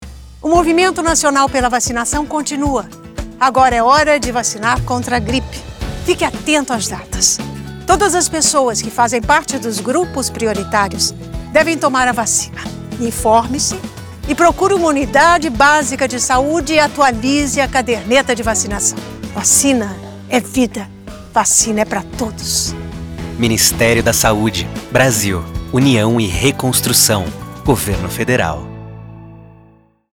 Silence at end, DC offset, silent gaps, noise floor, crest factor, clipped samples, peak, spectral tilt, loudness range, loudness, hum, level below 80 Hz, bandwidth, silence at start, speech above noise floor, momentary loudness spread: 0.7 s; under 0.1%; none; -48 dBFS; 14 dB; under 0.1%; 0 dBFS; -3 dB/octave; 3 LU; -14 LUFS; none; -32 dBFS; over 20 kHz; 0 s; 34 dB; 15 LU